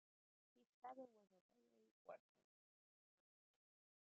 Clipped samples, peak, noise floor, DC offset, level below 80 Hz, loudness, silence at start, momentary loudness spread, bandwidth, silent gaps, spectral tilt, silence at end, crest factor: under 0.1%; -46 dBFS; under -90 dBFS; under 0.1%; under -90 dBFS; -63 LUFS; 0.55 s; 6 LU; 3.5 kHz; 0.66-0.82 s, 1.41-1.49 s, 1.91-2.05 s; 0 dB/octave; 1.85 s; 22 dB